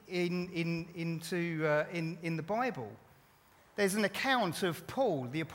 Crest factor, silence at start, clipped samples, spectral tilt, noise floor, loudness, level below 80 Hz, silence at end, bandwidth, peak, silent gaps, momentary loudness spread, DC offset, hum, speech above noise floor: 18 dB; 0.05 s; under 0.1%; -5 dB/octave; -64 dBFS; -34 LUFS; -72 dBFS; 0 s; 17 kHz; -16 dBFS; none; 8 LU; under 0.1%; none; 30 dB